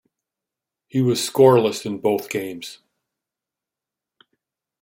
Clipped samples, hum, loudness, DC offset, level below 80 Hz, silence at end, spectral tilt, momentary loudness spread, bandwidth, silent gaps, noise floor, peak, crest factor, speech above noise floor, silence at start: under 0.1%; none; -19 LUFS; under 0.1%; -66 dBFS; 2.05 s; -5.5 dB/octave; 17 LU; 16.5 kHz; none; -87 dBFS; -2 dBFS; 20 dB; 68 dB; 0.95 s